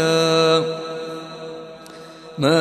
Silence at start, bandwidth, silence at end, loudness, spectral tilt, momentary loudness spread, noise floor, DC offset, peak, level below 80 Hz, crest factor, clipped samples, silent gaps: 0 s; 13.5 kHz; 0 s; -19 LUFS; -4.5 dB/octave; 22 LU; -39 dBFS; under 0.1%; -4 dBFS; -62 dBFS; 16 dB; under 0.1%; none